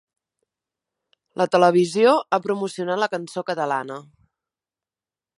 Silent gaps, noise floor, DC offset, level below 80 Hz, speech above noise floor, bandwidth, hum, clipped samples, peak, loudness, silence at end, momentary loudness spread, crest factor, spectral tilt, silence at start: none; under -90 dBFS; under 0.1%; -74 dBFS; over 69 dB; 11.5 kHz; none; under 0.1%; -2 dBFS; -21 LUFS; 1.4 s; 12 LU; 22 dB; -5.5 dB/octave; 1.35 s